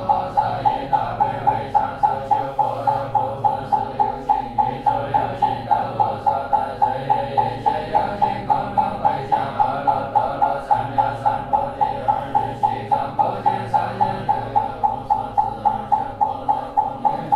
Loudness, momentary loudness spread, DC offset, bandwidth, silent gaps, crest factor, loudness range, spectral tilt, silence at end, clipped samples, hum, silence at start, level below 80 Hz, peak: -21 LUFS; 3 LU; under 0.1%; 10.5 kHz; none; 16 dB; 1 LU; -7 dB/octave; 0 s; under 0.1%; none; 0 s; -46 dBFS; -4 dBFS